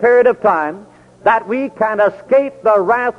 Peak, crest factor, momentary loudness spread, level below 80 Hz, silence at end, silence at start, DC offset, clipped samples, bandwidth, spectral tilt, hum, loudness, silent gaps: -2 dBFS; 12 dB; 8 LU; -56 dBFS; 0.05 s; 0 s; under 0.1%; under 0.1%; 6.6 kHz; -7 dB/octave; none; -15 LUFS; none